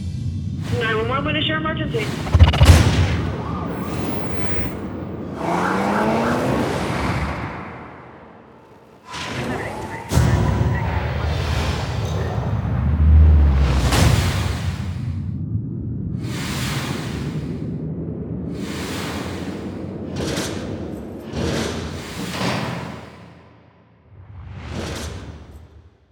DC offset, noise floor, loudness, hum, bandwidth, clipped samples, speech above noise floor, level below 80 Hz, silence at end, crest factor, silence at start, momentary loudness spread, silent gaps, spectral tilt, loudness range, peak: under 0.1%; -51 dBFS; -21 LUFS; none; over 20 kHz; under 0.1%; 29 dB; -28 dBFS; 0.25 s; 20 dB; 0 s; 14 LU; none; -6 dB/octave; 10 LU; 0 dBFS